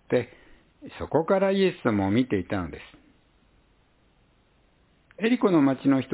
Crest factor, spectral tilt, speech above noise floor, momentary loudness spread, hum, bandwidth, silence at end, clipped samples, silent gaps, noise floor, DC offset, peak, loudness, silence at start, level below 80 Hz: 18 dB; -11 dB/octave; 39 dB; 17 LU; none; 4 kHz; 0 s; under 0.1%; none; -63 dBFS; under 0.1%; -8 dBFS; -24 LUFS; 0.1 s; -54 dBFS